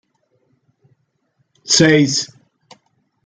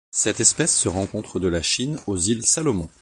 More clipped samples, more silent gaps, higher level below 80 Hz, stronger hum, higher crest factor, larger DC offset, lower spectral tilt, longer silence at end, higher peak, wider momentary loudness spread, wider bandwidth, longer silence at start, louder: neither; neither; second, -58 dBFS vs -42 dBFS; neither; about the same, 18 dB vs 20 dB; neither; about the same, -3.5 dB/octave vs -3 dB/octave; first, 1 s vs 0.15 s; about the same, -2 dBFS vs -2 dBFS; first, 20 LU vs 9 LU; second, 9.6 kHz vs 11.5 kHz; first, 1.65 s vs 0.15 s; first, -13 LUFS vs -20 LUFS